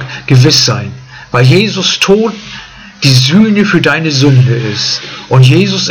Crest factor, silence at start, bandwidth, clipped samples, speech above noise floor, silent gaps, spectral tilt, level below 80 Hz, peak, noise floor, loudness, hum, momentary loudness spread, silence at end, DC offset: 8 dB; 0 s; 12 kHz; 2%; 21 dB; none; -5 dB/octave; -42 dBFS; 0 dBFS; -29 dBFS; -8 LUFS; none; 11 LU; 0 s; under 0.1%